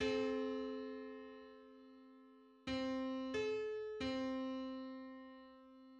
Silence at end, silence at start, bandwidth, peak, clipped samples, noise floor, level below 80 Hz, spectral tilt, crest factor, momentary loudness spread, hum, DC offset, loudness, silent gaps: 0 s; 0 s; 8.6 kHz; -28 dBFS; under 0.1%; -64 dBFS; -70 dBFS; -5 dB/octave; 16 dB; 21 LU; none; under 0.1%; -43 LUFS; none